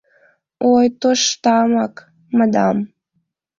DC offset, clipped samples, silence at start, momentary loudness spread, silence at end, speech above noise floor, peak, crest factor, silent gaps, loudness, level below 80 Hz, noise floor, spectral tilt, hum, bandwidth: under 0.1%; under 0.1%; 0.6 s; 8 LU; 0.75 s; 54 dB; -2 dBFS; 16 dB; none; -16 LUFS; -60 dBFS; -70 dBFS; -4 dB/octave; none; 7.6 kHz